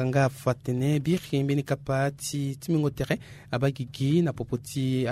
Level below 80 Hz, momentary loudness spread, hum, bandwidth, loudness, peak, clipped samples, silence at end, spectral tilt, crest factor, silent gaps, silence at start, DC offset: -54 dBFS; 6 LU; none; 15 kHz; -28 LUFS; -10 dBFS; under 0.1%; 0 s; -6.5 dB/octave; 16 dB; none; 0 s; under 0.1%